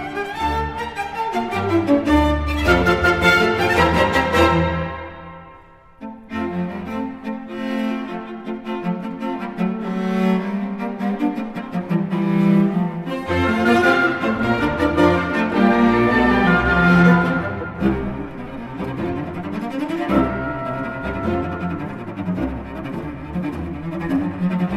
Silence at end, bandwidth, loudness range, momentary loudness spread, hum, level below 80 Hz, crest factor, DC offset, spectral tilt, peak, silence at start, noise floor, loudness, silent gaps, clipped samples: 0 s; 15 kHz; 10 LU; 13 LU; none; -36 dBFS; 18 dB; under 0.1%; -7 dB/octave; -2 dBFS; 0 s; -45 dBFS; -20 LUFS; none; under 0.1%